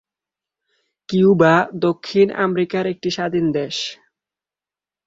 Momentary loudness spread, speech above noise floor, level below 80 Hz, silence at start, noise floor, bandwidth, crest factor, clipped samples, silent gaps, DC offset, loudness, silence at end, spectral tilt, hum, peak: 10 LU; over 73 dB; -58 dBFS; 1.1 s; under -90 dBFS; 7.8 kHz; 18 dB; under 0.1%; none; under 0.1%; -18 LUFS; 1.15 s; -6 dB/octave; none; -2 dBFS